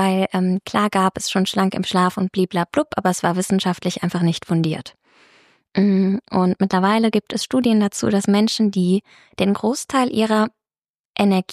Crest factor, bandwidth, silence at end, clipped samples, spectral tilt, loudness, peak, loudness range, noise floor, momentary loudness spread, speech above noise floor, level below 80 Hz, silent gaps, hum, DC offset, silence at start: 14 dB; 13.5 kHz; 0 s; under 0.1%; -5.5 dB/octave; -19 LUFS; -4 dBFS; 3 LU; under -90 dBFS; 5 LU; over 71 dB; -58 dBFS; 10.90-10.94 s, 11.00-11.14 s; none; under 0.1%; 0 s